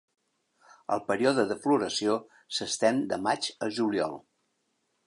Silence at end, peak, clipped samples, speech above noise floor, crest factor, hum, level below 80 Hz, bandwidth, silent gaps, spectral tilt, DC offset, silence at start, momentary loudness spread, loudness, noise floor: 0.85 s; -10 dBFS; under 0.1%; 48 dB; 20 dB; none; -72 dBFS; 11.5 kHz; none; -3.5 dB/octave; under 0.1%; 0.9 s; 8 LU; -28 LUFS; -76 dBFS